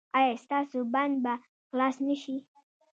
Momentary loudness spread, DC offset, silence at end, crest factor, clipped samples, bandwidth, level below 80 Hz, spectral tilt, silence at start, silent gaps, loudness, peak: 10 LU; under 0.1%; 0.6 s; 18 dB; under 0.1%; 7.8 kHz; -86 dBFS; -4.5 dB/octave; 0.15 s; 1.48-1.70 s; -30 LUFS; -12 dBFS